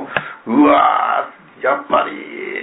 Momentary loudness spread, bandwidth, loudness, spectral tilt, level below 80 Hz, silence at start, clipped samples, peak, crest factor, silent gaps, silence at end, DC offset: 14 LU; 4 kHz; -16 LUFS; -9 dB/octave; -56 dBFS; 0 s; under 0.1%; -2 dBFS; 14 dB; none; 0 s; under 0.1%